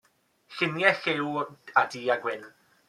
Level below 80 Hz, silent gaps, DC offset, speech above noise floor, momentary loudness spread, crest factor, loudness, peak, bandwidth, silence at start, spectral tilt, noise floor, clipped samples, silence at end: -78 dBFS; none; under 0.1%; 35 dB; 11 LU; 26 dB; -27 LUFS; -2 dBFS; 14 kHz; 0.5 s; -5 dB/octave; -62 dBFS; under 0.1%; 0.4 s